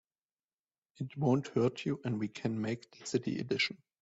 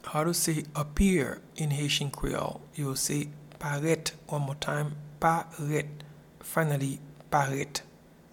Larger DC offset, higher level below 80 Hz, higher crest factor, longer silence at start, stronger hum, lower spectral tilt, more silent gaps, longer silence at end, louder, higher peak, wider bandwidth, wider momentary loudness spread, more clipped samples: neither; second, -72 dBFS vs -46 dBFS; about the same, 18 dB vs 22 dB; first, 1 s vs 0.05 s; neither; first, -6 dB/octave vs -4.5 dB/octave; neither; second, 0.25 s vs 0.45 s; second, -35 LUFS vs -30 LUFS; second, -16 dBFS vs -10 dBFS; second, 8 kHz vs 18 kHz; about the same, 8 LU vs 10 LU; neither